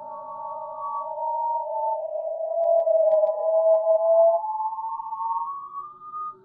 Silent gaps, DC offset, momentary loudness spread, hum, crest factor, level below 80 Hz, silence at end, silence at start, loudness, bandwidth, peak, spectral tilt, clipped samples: none; under 0.1%; 15 LU; none; 14 dB; -80 dBFS; 0.1 s; 0 s; -24 LUFS; 1.4 kHz; -10 dBFS; -8 dB/octave; under 0.1%